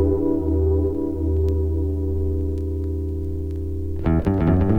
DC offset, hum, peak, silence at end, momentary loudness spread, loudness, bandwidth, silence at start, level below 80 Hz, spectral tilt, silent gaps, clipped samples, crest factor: under 0.1%; none; -6 dBFS; 0 s; 8 LU; -23 LUFS; 3.5 kHz; 0 s; -28 dBFS; -11 dB/octave; none; under 0.1%; 14 dB